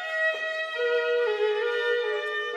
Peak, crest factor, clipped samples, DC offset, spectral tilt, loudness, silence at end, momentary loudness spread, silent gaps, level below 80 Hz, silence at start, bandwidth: -16 dBFS; 12 dB; under 0.1%; under 0.1%; 0.5 dB/octave; -26 LUFS; 0 s; 4 LU; none; under -90 dBFS; 0 s; 9.4 kHz